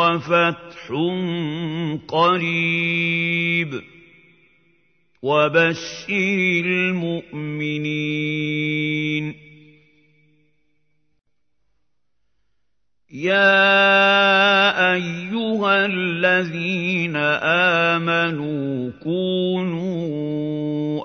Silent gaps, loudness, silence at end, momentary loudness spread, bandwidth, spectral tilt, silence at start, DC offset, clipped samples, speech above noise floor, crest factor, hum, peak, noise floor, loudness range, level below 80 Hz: none; -19 LUFS; 0 s; 12 LU; 6.6 kHz; -5.5 dB/octave; 0 s; under 0.1%; under 0.1%; 58 dB; 18 dB; none; -2 dBFS; -78 dBFS; 9 LU; -64 dBFS